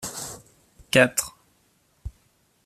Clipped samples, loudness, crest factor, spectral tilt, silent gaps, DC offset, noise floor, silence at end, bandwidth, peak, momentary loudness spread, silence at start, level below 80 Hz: under 0.1%; -22 LUFS; 26 dB; -3 dB/octave; none; under 0.1%; -65 dBFS; 0.55 s; 14.5 kHz; -2 dBFS; 24 LU; 0 s; -50 dBFS